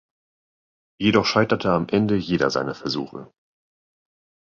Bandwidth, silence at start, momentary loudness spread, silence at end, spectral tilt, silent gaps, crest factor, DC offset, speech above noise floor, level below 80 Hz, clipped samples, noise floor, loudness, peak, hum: 7.4 kHz; 1 s; 10 LU; 1.15 s; -6 dB/octave; none; 22 dB; under 0.1%; over 69 dB; -54 dBFS; under 0.1%; under -90 dBFS; -21 LUFS; -2 dBFS; none